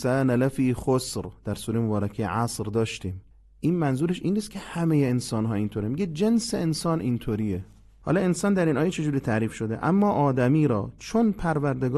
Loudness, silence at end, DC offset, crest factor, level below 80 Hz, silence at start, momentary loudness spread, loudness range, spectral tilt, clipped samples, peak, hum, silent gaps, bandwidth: -25 LUFS; 0 s; under 0.1%; 14 dB; -50 dBFS; 0 s; 8 LU; 4 LU; -6.5 dB/octave; under 0.1%; -10 dBFS; none; none; 12.5 kHz